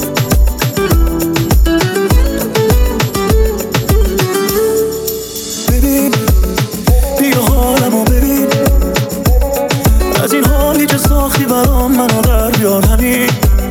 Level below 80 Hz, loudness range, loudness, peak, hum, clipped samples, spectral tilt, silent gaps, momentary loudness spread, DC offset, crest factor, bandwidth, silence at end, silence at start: -14 dBFS; 2 LU; -12 LUFS; 0 dBFS; none; under 0.1%; -5 dB/octave; none; 3 LU; under 0.1%; 10 dB; 18.5 kHz; 0 s; 0 s